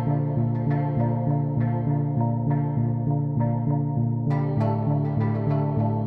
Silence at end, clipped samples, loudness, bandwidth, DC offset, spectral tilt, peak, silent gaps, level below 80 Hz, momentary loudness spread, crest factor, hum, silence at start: 0 s; under 0.1%; -24 LUFS; 4.4 kHz; under 0.1%; -12.5 dB/octave; -12 dBFS; none; -50 dBFS; 1 LU; 10 dB; none; 0 s